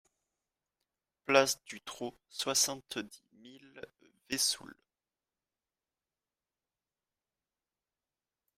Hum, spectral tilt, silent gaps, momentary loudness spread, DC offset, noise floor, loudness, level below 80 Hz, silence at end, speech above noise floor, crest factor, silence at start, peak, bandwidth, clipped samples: none; -1 dB/octave; none; 24 LU; under 0.1%; under -90 dBFS; -32 LUFS; -78 dBFS; 3.85 s; over 56 dB; 28 dB; 1.3 s; -10 dBFS; 16 kHz; under 0.1%